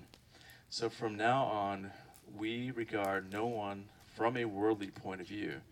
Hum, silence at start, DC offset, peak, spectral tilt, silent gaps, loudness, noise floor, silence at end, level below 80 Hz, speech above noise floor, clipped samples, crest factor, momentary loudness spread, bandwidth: none; 0 s; under 0.1%; -20 dBFS; -5.5 dB/octave; none; -37 LUFS; -60 dBFS; 0.1 s; -72 dBFS; 23 dB; under 0.1%; 18 dB; 17 LU; 17 kHz